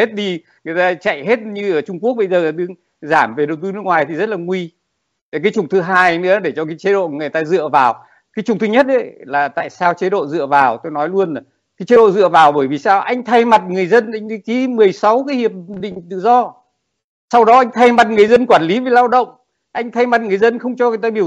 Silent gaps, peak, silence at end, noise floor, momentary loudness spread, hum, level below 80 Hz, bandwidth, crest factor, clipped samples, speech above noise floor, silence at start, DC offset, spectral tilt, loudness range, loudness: 5.21-5.32 s, 17.04-17.28 s; 0 dBFS; 0 s; -72 dBFS; 14 LU; none; -60 dBFS; 8.8 kHz; 14 dB; under 0.1%; 58 dB; 0 s; under 0.1%; -6 dB/octave; 5 LU; -14 LUFS